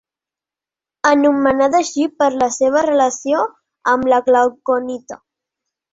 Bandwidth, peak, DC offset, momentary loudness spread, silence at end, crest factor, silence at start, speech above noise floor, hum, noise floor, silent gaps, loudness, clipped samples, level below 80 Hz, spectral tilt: 8 kHz; -2 dBFS; under 0.1%; 9 LU; 0.8 s; 16 dB; 1.05 s; 74 dB; none; -89 dBFS; none; -16 LUFS; under 0.1%; -56 dBFS; -3.5 dB/octave